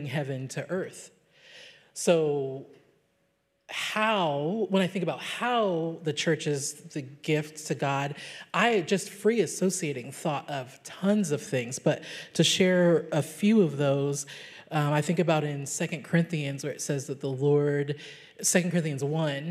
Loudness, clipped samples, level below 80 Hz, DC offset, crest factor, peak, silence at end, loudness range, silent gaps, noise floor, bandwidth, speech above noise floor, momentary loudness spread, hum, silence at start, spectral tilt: -28 LUFS; under 0.1%; -80 dBFS; under 0.1%; 20 dB; -8 dBFS; 0 s; 4 LU; none; -73 dBFS; 15.5 kHz; 45 dB; 11 LU; none; 0 s; -4.5 dB/octave